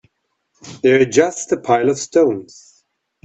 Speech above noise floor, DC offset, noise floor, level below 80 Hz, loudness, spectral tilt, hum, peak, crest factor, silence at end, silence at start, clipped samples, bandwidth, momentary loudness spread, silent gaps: 54 dB; under 0.1%; -69 dBFS; -60 dBFS; -16 LUFS; -4.5 dB/octave; none; 0 dBFS; 18 dB; 0.8 s; 0.65 s; under 0.1%; 8.2 kHz; 7 LU; none